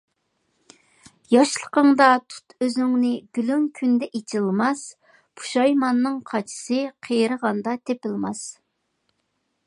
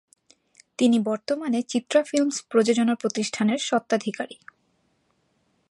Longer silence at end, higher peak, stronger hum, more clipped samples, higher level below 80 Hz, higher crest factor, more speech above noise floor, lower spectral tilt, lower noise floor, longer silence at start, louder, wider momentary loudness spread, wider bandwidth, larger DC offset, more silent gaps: second, 1.15 s vs 1.4 s; first, -2 dBFS vs -8 dBFS; neither; neither; about the same, -74 dBFS vs -76 dBFS; about the same, 22 dB vs 18 dB; first, 52 dB vs 46 dB; about the same, -4.5 dB/octave vs -4 dB/octave; first, -73 dBFS vs -69 dBFS; first, 1.3 s vs 0.8 s; about the same, -22 LUFS vs -24 LUFS; first, 11 LU vs 7 LU; about the same, 11.5 kHz vs 11.5 kHz; neither; neither